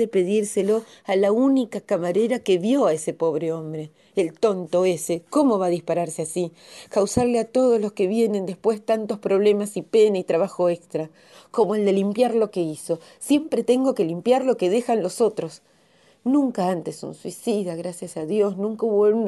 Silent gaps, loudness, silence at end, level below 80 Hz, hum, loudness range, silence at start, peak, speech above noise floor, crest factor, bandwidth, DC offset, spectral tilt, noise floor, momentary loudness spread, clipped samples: none; -22 LUFS; 0 s; -64 dBFS; none; 3 LU; 0 s; -6 dBFS; 36 dB; 16 dB; 12 kHz; under 0.1%; -5.5 dB/octave; -58 dBFS; 10 LU; under 0.1%